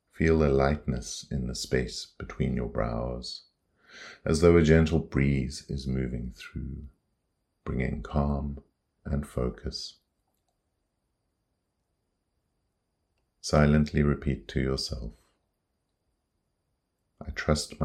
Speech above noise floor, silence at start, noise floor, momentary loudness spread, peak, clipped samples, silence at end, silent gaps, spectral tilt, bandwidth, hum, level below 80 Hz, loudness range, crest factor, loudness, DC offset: 52 dB; 0.2 s; -79 dBFS; 18 LU; -6 dBFS; under 0.1%; 0 s; none; -6 dB/octave; 13 kHz; none; -40 dBFS; 12 LU; 24 dB; -28 LUFS; under 0.1%